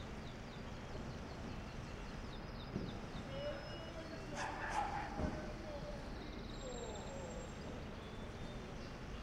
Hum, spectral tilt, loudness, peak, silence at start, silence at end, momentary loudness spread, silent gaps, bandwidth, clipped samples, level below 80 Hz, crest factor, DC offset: none; -5.5 dB/octave; -47 LUFS; -26 dBFS; 0 s; 0 s; 7 LU; none; 16 kHz; under 0.1%; -52 dBFS; 20 dB; under 0.1%